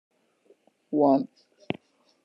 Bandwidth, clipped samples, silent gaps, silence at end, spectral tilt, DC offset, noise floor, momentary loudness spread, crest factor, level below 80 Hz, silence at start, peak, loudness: 6 kHz; under 0.1%; none; 0.5 s; -9 dB/octave; under 0.1%; -63 dBFS; 15 LU; 20 dB; -76 dBFS; 0.9 s; -10 dBFS; -26 LUFS